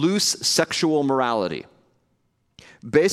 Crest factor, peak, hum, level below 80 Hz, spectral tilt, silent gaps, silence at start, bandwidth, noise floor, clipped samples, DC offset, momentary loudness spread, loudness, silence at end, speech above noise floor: 20 dB; -2 dBFS; none; -62 dBFS; -3.5 dB/octave; none; 0 s; 16 kHz; -69 dBFS; under 0.1%; under 0.1%; 11 LU; -21 LUFS; 0 s; 48 dB